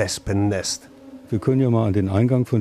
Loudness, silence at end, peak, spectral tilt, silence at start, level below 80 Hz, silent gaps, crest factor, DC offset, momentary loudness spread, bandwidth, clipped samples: -21 LUFS; 0 s; -6 dBFS; -6 dB/octave; 0 s; -46 dBFS; none; 16 dB; under 0.1%; 8 LU; 14 kHz; under 0.1%